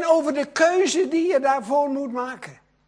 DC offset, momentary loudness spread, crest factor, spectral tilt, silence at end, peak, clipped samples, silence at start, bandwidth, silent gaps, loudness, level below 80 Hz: under 0.1%; 12 LU; 18 dB; -3 dB/octave; 0.35 s; -4 dBFS; under 0.1%; 0 s; 10.5 kHz; none; -21 LUFS; -70 dBFS